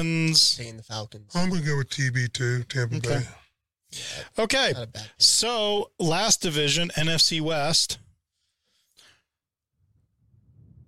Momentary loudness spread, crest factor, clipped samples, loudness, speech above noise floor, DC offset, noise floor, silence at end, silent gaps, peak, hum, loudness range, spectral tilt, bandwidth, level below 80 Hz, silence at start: 17 LU; 20 dB; under 0.1%; -23 LUFS; 62 dB; under 0.1%; -87 dBFS; 0 s; none; -6 dBFS; none; 7 LU; -3 dB/octave; 16.5 kHz; -54 dBFS; 0 s